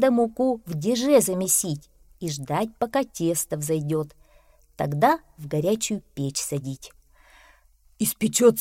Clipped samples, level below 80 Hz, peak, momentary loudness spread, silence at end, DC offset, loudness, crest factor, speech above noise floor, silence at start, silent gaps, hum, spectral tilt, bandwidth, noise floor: under 0.1%; -56 dBFS; -4 dBFS; 12 LU; 0 s; under 0.1%; -24 LUFS; 20 dB; 34 dB; 0 s; none; none; -4.5 dB/octave; 16.5 kHz; -58 dBFS